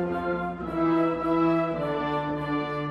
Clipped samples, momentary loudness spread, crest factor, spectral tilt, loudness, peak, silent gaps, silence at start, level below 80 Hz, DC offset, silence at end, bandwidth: under 0.1%; 6 LU; 12 dB; -8.5 dB/octave; -26 LUFS; -14 dBFS; none; 0 s; -50 dBFS; under 0.1%; 0 s; 5.6 kHz